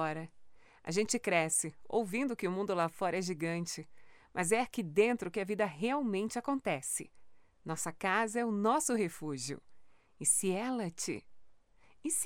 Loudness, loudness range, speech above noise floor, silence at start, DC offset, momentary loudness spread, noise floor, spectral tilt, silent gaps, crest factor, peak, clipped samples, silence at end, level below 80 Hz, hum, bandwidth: -34 LUFS; 2 LU; 28 dB; 0 s; under 0.1%; 12 LU; -62 dBFS; -3.5 dB/octave; none; 20 dB; -16 dBFS; under 0.1%; 0 s; -72 dBFS; none; 18.5 kHz